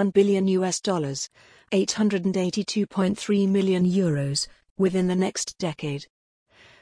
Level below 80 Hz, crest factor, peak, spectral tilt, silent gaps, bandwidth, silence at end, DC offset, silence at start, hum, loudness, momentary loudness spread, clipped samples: -62 dBFS; 16 dB; -8 dBFS; -5.5 dB/octave; 4.70-4.76 s; 10.5 kHz; 0.75 s; under 0.1%; 0 s; none; -24 LUFS; 9 LU; under 0.1%